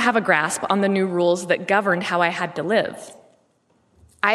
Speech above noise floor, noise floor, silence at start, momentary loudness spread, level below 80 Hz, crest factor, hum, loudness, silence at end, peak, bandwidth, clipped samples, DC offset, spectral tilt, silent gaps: 43 dB; -63 dBFS; 0 s; 5 LU; -68 dBFS; 20 dB; none; -20 LUFS; 0 s; -2 dBFS; 13.5 kHz; under 0.1%; under 0.1%; -4.5 dB/octave; none